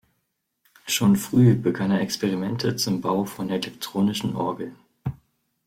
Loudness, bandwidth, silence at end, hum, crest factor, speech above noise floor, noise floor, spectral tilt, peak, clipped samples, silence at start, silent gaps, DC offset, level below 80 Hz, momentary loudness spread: -23 LUFS; 16.5 kHz; 0.55 s; none; 18 dB; 53 dB; -76 dBFS; -5.5 dB/octave; -6 dBFS; under 0.1%; 0.85 s; none; under 0.1%; -58 dBFS; 16 LU